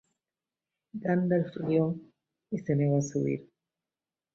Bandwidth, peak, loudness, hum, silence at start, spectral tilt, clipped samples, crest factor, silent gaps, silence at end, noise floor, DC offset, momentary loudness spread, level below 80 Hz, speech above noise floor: 7.6 kHz; -14 dBFS; -30 LUFS; none; 0.95 s; -8 dB/octave; under 0.1%; 18 dB; none; 0.9 s; under -90 dBFS; under 0.1%; 11 LU; -68 dBFS; over 62 dB